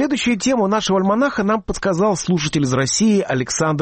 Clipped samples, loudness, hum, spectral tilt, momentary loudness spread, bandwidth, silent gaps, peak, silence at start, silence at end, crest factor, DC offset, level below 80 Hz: under 0.1%; -18 LUFS; none; -4.5 dB/octave; 4 LU; 8.8 kHz; none; -8 dBFS; 0 s; 0 s; 10 dB; under 0.1%; -44 dBFS